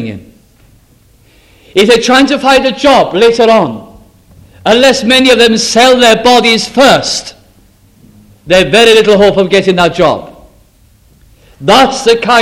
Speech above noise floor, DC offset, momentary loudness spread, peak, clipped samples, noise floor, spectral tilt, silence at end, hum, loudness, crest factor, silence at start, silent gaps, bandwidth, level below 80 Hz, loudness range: 38 dB; under 0.1%; 10 LU; 0 dBFS; 2%; -45 dBFS; -3.5 dB/octave; 0 s; none; -7 LUFS; 8 dB; 0 s; none; 16.5 kHz; -38 dBFS; 3 LU